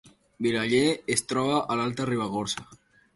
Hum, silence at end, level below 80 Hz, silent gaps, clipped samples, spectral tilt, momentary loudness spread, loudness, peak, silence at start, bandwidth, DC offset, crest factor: none; 0.4 s; -62 dBFS; none; under 0.1%; -4 dB/octave; 7 LU; -27 LUFS; -8 dBFS; 0.4 s; 12 kHz; under 0.1%; 18 dB